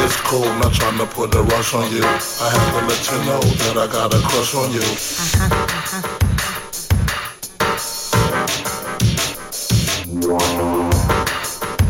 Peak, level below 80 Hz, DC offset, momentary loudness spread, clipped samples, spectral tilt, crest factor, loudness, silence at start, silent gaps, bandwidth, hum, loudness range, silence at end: -4 dBFS; -30 dBFS; under 0.1%; 6 LU; under 0.1%; -4 dB/octave; 14 dB; -18 LUFS; 0 s; none; 17 kHz; none; 3 LU; 0 s